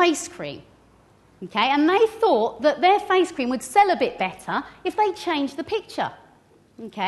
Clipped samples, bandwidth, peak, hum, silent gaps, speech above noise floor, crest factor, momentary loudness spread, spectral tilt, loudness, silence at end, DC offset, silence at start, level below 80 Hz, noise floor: under 0.1%; 12.5 kHz; -6 dBFS; none; none; 34 dB; 18 dB; 15 LU; -3.5 dB/octave; -22 LUFS; 0 s; under 0.1%; 0 s; -62 dBFS; -56 dBFS